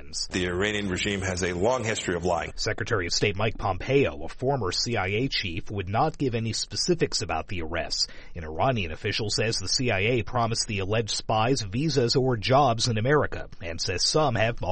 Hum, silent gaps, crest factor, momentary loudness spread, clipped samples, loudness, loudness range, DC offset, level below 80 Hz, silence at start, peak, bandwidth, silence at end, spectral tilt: none; none; 16 dB; 7 LU; under 0.1%; -26 LUFS; 3 LU; under 0.1%; -42 dBFS; 0 s; -10 dBFS; 8.8 kHz; 0 s; -4 dB/octave